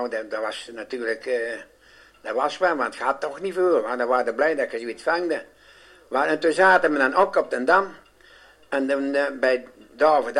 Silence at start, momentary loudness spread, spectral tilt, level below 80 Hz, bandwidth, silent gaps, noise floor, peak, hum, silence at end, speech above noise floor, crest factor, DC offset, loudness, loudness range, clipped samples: 0 s; 11 LU; -4 dB/octave; -66 dBFS; 11.5 kHz; none; -53 dBFS; -4 dBFS; none; 0 s; 30 dB; 20 dB; under 0.1%; -23 LUFS; 5 LU; under 0.1%